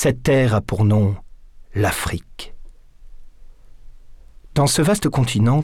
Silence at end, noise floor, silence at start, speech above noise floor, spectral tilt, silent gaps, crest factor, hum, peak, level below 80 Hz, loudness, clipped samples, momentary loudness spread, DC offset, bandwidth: 0 s; -41 dBFS; 0 s; 23 dB; -5.5 dB/octave; none; 12 dB; none; -8 dBFS; -38 dBFS; -19 LUFS; under 0.1%; 15 LU; under 0.1%; 16.5 kHz